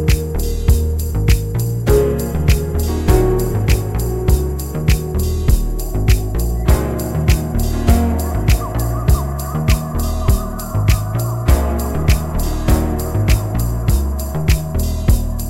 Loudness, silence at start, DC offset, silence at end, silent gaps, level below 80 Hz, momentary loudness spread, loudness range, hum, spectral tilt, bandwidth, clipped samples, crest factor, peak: -17 LUFS; 0 s; under 0.1%; 0 s; none; -18 dBFS; 5 LU; 1 LU; none; -6 dB/octave; 16.5 kHz; under 0.1%; 14 dB; -2 dBFS